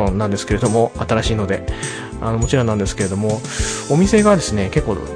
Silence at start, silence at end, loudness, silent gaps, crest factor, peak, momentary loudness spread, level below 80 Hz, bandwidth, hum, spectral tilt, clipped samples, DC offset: 0 s; 0 s; -18 LUFS; none; 16 dB; -2 dBFS; 9 LU; -30 dBFS; 10.5 kHz; none; -5.5 dB/octave; under 0.1%; under 0.1%